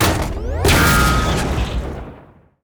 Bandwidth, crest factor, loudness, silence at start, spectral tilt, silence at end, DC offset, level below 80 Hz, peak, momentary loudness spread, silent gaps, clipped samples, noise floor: over 20 kHz; 12 dB; -17 LUFS; 0 s; -4.5 dB/octave; 0.45 s; under 0.1%; -24 dBFS; -4 dBFS; 17 LU; none; under 0.1%; -45 dBFS